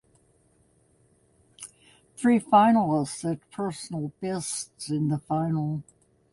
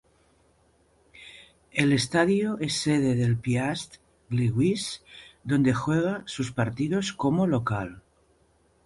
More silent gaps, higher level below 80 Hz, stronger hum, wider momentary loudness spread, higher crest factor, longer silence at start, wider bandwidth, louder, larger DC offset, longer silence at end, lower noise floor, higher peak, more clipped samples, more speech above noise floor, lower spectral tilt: neither; second, -64 dBFS vs -56 dBFS; neither; about the same, 17 LU vs 16 LU; about the same, 20 dB vs 20 dB; first, 1.6 s vs 1.15 s; about the same, 11.5 kHz vs 11.5 kHz; about the same, -26 LUFS vs -26 LUFS; neither; second, 0.5 s vs 0.85 s; about the same, -64 dBFS vs -64 dBFS; about the same, -8 dBFS vs -8 dBFS; neither; about the same, 39 dB vs 39 dB; about the same, -6 dB/octave vs -6 dB/octave